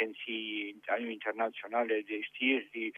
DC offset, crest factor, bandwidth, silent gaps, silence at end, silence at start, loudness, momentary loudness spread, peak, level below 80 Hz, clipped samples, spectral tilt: under 0.1%; 18 dB; 3.9 kHz; none; 0 s; 0 s; -34 LUFS; 7 LU; -16 dBFS; under -90 dBFS; under 0.1%; -5 dB/octave